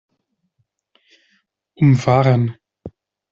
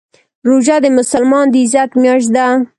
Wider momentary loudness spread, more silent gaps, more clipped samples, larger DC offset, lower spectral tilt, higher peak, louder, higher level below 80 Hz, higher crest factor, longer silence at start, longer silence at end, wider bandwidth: first, 11 LU vs 2 LU; neither; neither; neither; first, -8 dB/octave vs -4 dB/octave; about the same, -2 dBFS vs 0 dBFS; second, -16 LUFS vs -11 LUFS; about the same, -54 dBFS vs -56 dBFS; first, 18 dB vs 10 dB; first, 1.8 s vs 0.45 s; first, 0.45 s vs 0.15 s; second, 7.4 kHz vs 11.5 kHz